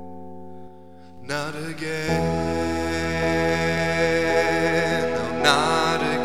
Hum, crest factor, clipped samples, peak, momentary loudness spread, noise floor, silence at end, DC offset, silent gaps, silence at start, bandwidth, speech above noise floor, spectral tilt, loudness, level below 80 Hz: none; 22 dB; under 0.1%; 0 dBFS; 17 LU; -46 dBFS; 0 s; 1%; none; 0 s; 16 kHz; 21 dB; -4.5 dB/octave; -22 LUFS; -44 dBFS